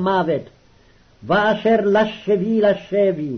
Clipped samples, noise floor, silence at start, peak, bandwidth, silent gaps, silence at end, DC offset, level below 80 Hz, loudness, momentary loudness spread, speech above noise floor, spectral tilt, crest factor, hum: under 0.1%; -52 dBFS; 0 s; -6 dBFS; 6.4 kHz; none; 0 s; under 0.1%; -54 dBFS; -18 LUFS; 5 LU; 34 dB; -7.5 dB/octave; 12 dB; none